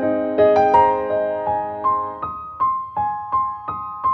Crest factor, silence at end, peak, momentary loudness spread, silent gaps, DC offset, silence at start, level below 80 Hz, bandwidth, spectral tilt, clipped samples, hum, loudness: 18 dB; 0 s; -2 dBFS; 13 LU; none; under 0.1%; 0 s; -50 dBFS; 6.2 kHz; -7.5 dB/octave; under 0.1%; none; -20 LUFS